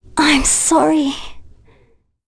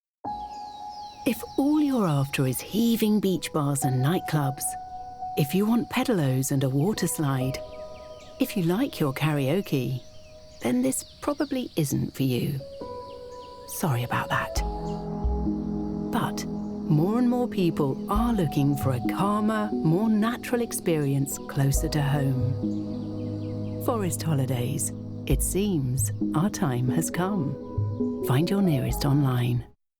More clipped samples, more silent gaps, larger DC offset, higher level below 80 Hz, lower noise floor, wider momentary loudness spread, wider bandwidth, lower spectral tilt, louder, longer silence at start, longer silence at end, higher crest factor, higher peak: neither; neither; neither; first, -34 dBFS vs -40 dBFS; first, -55 dBFS vs -46 dBFS; about the same, 10 LU vs 11 LU; second, 11 kHz vs over 20 kHz; second, -1.5 dB/octave vs -6 dB/octave; first, -13 LUFS vs -26 LUFS; about the same, 0.15 s vs 0.25 s; first, 0.8 s vs 0.3 s; about the same, 14 dB vs 14 dB; first, -4 dBFS vs -10 dBFS